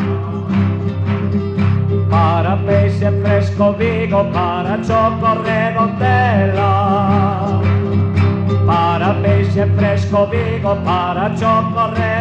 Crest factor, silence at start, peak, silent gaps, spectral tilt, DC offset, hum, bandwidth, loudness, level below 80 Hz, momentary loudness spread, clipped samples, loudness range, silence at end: 12 dB; 0 s; -2 dBFS; none; -8.5 dB/octave; under 0.1%; none; 7 kHz; -15 LUFS; -42 dBFS; 4 LU; under 0.1%; 1 LU; 0 s